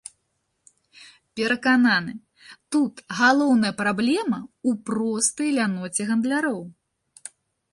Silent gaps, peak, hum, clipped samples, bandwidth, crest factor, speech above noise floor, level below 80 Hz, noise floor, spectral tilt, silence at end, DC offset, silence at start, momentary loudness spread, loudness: none; -6 dBFS; none; under 0.1%; 11.5 kHz; 18 dB; 52 dB; -68 dBFS; -74 dBFS; -3.5 dB/octave; 1 s; under 0.1%; 1 s; 23 LU; -22 LUFS